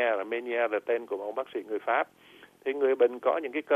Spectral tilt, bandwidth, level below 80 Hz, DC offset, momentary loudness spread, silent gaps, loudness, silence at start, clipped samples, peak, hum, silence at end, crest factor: -5 dB/octave; 4 kHz; -80 dBFS; under 0.1%; 10 LU; none; -29 LUFS; 0 s; under 0.1%; -12 dBFS; none; 0 s; 16 dB